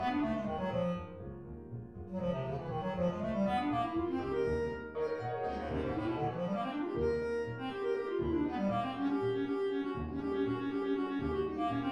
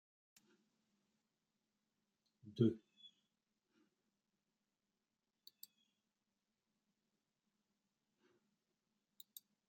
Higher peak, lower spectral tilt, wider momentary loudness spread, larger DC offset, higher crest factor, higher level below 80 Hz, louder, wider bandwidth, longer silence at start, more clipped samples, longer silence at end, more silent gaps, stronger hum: about the same, -22 dBFS vs -22 dBFS; about the same, -8 dB/octave vs -9 dB/octave; second, 5 LU vs 26 LU; neither; second, 12 dB vs 30 dB; first, -54 dBFS vs under -90 dBFS; first, -35 LUFS vs -40 LUFS; first, 9.8 kHz vs 7.6 kHz; second, 0 s vs 2.45 s; neither; second, 0 s vs 6.9 s; neither; neither